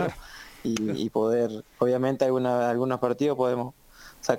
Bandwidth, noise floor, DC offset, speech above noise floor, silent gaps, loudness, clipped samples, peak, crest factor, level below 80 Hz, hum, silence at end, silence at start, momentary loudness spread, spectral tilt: 17 kHz; -45 dBFS; under 0.1%; 20 dB; none; -26 LUFS; under 0.1%; -6 dBFS; 20 dB; -58 dBFS; none; 0 s; 0 s; 10 LU; -6 dB/octave